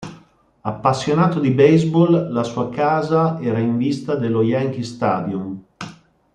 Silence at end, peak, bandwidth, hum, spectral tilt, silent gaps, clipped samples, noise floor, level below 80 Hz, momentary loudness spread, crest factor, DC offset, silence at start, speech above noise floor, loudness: 0.4 s; -2 dBFS; 9.4 kHz; none; -7.5 dB/octave; none; under 0.1%; -50 dBFS; -56 dBFS; 16 LU; 16 dB; under 0.1%; 0 s; 33 dB; -18 LUFS